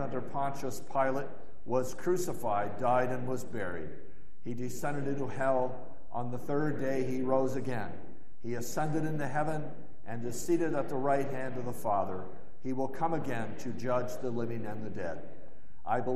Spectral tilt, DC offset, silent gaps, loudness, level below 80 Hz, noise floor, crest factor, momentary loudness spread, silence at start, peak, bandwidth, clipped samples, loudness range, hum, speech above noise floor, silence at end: -6.5 dB/octave; 3%; none; -34 LUFS; -62 dBFS; -56 dBFS; 18 dB; 13 LU; 0 s; -14 dBFS; 14 kHz; under 0.1%; 3 LU; none; 23 dB; 0 s